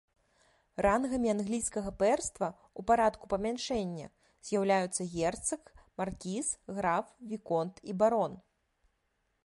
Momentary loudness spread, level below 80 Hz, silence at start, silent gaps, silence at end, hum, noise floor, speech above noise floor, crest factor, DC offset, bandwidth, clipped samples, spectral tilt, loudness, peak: 12 LU; -58 dBFS; 0.8 s; none; 1.05 s; none; -78 dBFS; 46 dB; 18 dB; under 0.1%; 11.5 kHz; under 0.1%; -4.5 dB/octave; -32 LUFS; -14 dBFS